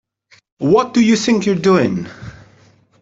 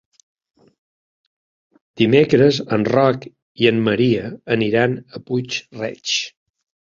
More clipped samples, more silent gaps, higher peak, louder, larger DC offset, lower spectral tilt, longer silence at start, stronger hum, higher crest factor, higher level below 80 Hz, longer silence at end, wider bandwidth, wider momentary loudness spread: neither; second, none vs 3.42-3.55 s; about the same, -2 dBFS vs -2 dBFS; first, -15 LUFS vs -18 LUFS; neither; about the same, -5.5 dB/octave vs -5.5 dB/octave; second, 0.6 s vs 1.95 s; neither; about the same, 14 dB vs 18 dB; about the same, -52 dBFS vs -56 dBFS; about the same, 0.7 s vs 0.65 s; about the same, 7.8 kHz vs 7.6 kHz; first, 19 LU vs 12 LU